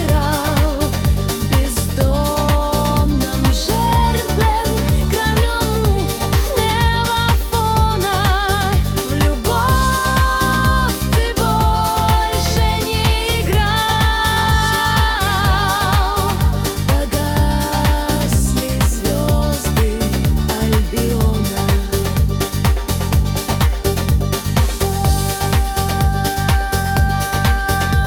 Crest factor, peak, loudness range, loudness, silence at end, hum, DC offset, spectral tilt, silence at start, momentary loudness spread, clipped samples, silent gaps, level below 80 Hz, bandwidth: 14 dB; -2 dBFS; 2 LU; -16 LUFS; 0 s; none; under 0.1%; -5 dB/octave; 0 s; 3 LU; under 0.1%; none; -20 dBFS; 18 kHz